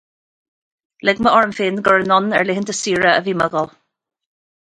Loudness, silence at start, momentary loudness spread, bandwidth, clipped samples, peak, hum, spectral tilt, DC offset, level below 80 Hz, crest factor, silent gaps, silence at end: -16 LUFS; 1.05 s; 7 LU; 11 kHz; under 0.1%; 0 dBFS; none; -4 dB/octave; under 0.1%; -56 dBFS; 18 dB; none; 1.05 s